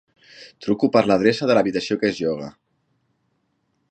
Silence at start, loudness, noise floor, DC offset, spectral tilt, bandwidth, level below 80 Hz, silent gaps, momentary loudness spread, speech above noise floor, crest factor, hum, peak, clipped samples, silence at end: 0.4 s; -20 LUFS; -70 dBFS; under 0.1%; -6 dB/octave; 9.2 kHz; -60 dBFS; none; 13 LU; 50 dB; 22 dB; none; -2 dBFS; under 0.1%; 1.4 s